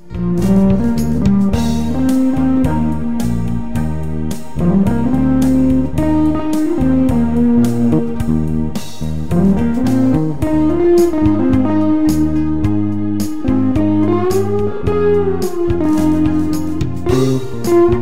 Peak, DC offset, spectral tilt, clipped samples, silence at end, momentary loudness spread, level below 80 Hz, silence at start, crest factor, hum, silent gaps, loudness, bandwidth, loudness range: -2 dBFS; 9%; -8 dB/octave; under 0.1%; 0 s; 7 LU; -28 dBFS; 0 s; 12 dB; none; none; -15 LUFS; 16 kHz; 2 LU